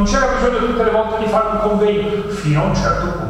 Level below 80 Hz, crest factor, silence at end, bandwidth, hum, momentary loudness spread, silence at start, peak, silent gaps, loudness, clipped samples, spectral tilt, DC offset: -28 dBFS; 14 dB; 0 s; 12 kHz; none; 3 LU; 0 s; -2 dBFS; none; -16 LUFS; under 0.1%; -6 dB/octave; under 0.1%